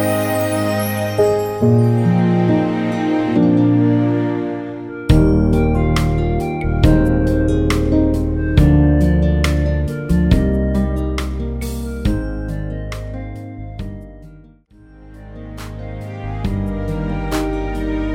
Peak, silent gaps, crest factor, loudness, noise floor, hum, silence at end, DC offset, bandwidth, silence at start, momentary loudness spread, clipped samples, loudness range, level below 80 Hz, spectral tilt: 0 dBFS; none; 16 dB; -17 LUFS; -45 dBFS; none; 0 s; under 0.1%; 19.5 kHz; 0 s; 16 LU; under 0.1%; 13 LU; -22 dBFS; -7.5 dB/octave